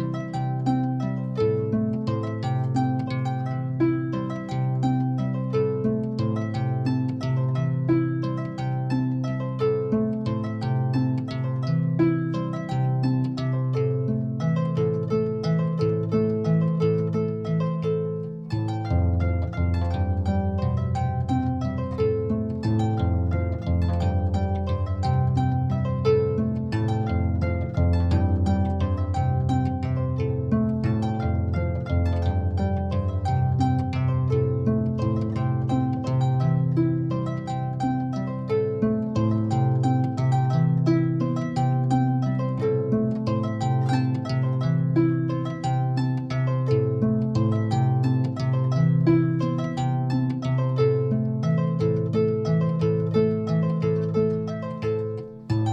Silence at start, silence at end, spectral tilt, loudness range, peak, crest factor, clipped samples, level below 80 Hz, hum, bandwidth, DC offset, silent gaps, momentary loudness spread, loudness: 0 s; 0 s; -9 dB/octave; 3 LU; -8 dBFS; 16 dB; under 0.1%; -40 dBFS; none; 7.4 kHz; under 0.1%; none; 5 LU; -24 LUFS